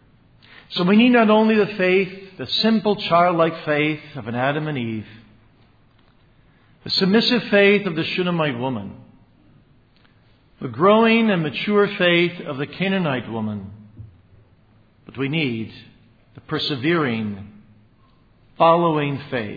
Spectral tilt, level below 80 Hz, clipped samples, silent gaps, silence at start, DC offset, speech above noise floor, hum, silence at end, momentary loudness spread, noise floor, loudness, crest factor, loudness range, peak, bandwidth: -7.5 dB/octave; -60 dBFS; under 0.1%; none; 0.7 s; under 0.1%; 36 dB; none; 0 s; 15 LU; -55 dBFS; -19 LUFS; 18 dB; 9 LU; -2 dBFS; 5 kHz